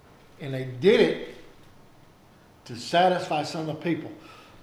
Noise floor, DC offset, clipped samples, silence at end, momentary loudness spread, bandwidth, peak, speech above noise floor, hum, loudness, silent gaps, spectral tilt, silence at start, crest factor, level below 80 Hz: -54 dBFS; under 0.1%; under 0.1%; 0.2 s; 21 LU; 13.5 kHz; -6 dBFS; 30 dB; none; -25 LUFS; none; -5.5 dB/octave; 0.4 s; 20 dB; -60 dBFS